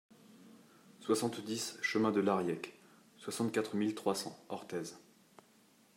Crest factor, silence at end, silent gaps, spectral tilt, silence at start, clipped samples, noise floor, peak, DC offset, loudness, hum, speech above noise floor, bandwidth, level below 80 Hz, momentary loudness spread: 20 dB; 0.95 s; none; -4.5 dB/octave; 0.3 s; under 0.1%; -66 dBFS; -18 dBFS; under 0.1%; -36 LUFS; none; 31 dB; 16 kHz; -82 dBFS; 15 LU